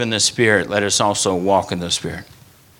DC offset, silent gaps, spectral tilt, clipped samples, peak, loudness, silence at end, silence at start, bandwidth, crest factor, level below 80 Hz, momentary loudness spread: under 0.1%; none; -3 dB/octave; under 0.1%; 0 dBFS; -17 LUFS; 0.55 s; 0 s; 19 kHz; 18 dB; -52 dBFS; 7 LU